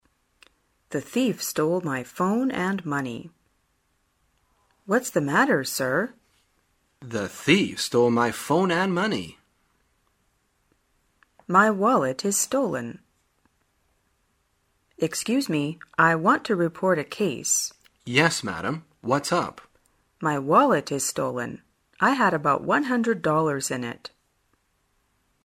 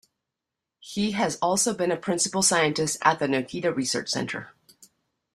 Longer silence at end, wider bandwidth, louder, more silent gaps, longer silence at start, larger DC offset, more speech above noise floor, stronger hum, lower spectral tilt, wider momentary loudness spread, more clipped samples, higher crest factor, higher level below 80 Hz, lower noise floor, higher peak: first, 1.4 s vs 0.5 s; about the same, 16 kHz vs 15 kHz; about the same, -24 LUFS vs -24 LUFS; neither; about the same, 0.9 s vs 0.85 s; neither; second, 47 dB vs 61 dB; neither; about the same, -4 dB/octave vs -3 dB/octave; first, 12 LU vs 8 LU; neither; about the same, 22 dB vs 22 dB; about the same, -64 dBFS vs -64 dBFS; second, -70 dBFS vs -86 dBFS; about the same, -4 dBFS vs -4 dBFS